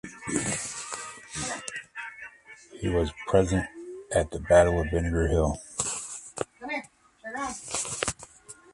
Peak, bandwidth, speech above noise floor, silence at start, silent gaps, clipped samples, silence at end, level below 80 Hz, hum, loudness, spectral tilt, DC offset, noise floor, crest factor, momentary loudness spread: -6 dBFS; 11.5 kHz; 26 dB; 0.05 s; none; under 0.1%; 0.2 s; -40 dBFS; none; -28 LUFS; -4.5 dB/octave; under 0.1%; -50 dBFS; 22 dB; 16 LU